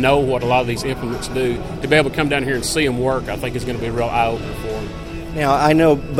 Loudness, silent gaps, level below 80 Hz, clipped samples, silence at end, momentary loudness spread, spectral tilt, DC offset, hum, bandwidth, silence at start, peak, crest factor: -19 LUFS; none; -34 dBFS; under 0.1%; 0 s; 12 LU; -5 dB/octave; 0.4%; none; 16 kHz; 0 s; 0 dBFS; 18 dB